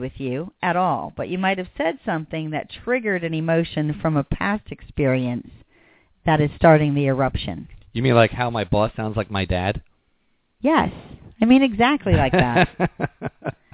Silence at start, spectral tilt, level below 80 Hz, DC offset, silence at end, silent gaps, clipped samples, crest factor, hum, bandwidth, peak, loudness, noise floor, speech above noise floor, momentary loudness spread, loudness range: 0 s; -11 dB/octave; -40 dBFS; under 0.1%; 0.2 s; none; under 0.1%; 20 dB; none; 4 kHz; 0 dBFS; -21 LUFS; -66 dBFS; 45 dB; 12 LU; 4 LU